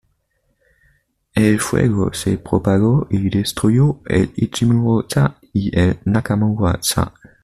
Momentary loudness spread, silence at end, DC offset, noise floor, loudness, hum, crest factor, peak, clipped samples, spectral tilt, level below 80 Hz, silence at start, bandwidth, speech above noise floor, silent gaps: 5 LU; 0.35 s; under 0.1%; -66 dBFS; -17 LUFS; none; 14 dB; -2 dBFS; under 0.1%; -6 dB/octave; -40 dBFS; 1.35 s; 14.5 kHz; 50 dB; none